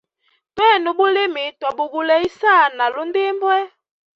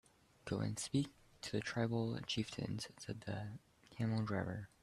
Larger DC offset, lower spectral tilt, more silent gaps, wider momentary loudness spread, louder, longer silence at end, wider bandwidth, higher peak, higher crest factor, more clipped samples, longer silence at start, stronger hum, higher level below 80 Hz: neither; second, -4 dB/octave vs -5.5 dB/octave; neither; about the same, 9 LU vs 11 LU; first, -17 LUFS vs -42 LUFS; first, 0.5 s vs 0.15 s; second, 7.2 kHz vs 13 kHz; first, -2 dBFS vs -24 dBFS; about the same, 16 dB vs 18 dB; neither; about the same, 0.55 s vs 0.45 s; neither; about the same, -64 dBFS vs -68 dBFS